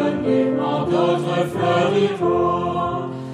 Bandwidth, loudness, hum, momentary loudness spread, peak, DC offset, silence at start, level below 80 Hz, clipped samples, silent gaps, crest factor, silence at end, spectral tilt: 11.5 kHz; -20 LUFS; none; 4 LU; -6 dBFS; under 0.1%; 0 s; -52 dBFS; under 0.1%; none; 14 dB; 0 s; -7 dB/octave